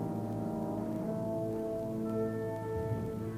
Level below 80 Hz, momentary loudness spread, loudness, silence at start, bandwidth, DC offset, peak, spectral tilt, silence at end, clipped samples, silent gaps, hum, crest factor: -56 dBFS; 2 LU; -36 LUFS; 0 s; 16 kHz; under 0.1%; -24 dBFS; -9 dB/octave; 0 s; under 0.1%; none; none; 12 dB